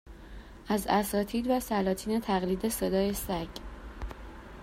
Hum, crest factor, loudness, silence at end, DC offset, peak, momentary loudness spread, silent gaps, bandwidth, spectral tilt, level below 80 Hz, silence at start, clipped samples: none; 18 dB; -30 LUFS; 0 s; under 0.1%; -12 dBFS; 19 LU; none; 16 kHz; -5 dB/octave; -46 dBFS; 0.05 s; under 0.1%